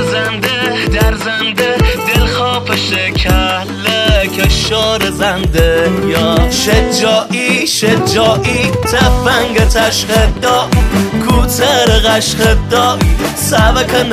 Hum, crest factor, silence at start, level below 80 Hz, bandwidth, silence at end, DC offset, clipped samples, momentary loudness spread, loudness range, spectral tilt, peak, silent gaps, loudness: none; 10 dB; 0 s; -18 dBFS; 15.5 kHz; 0 s; under 0.1%; under 0.1%; 3 LU; 2 LU; -4 dB/octave; 0 dBFS; none; -11 LUFS